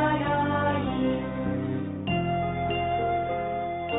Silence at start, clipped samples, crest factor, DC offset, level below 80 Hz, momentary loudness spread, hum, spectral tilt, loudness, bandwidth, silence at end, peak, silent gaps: 0 s; under 0.1%; 14 dB; under 0.1%; -48 dBFS; 5 LU; none; -5.5 dB/octave; -27 LUFS; 4 kHz; 0 s; -12 dBFS; none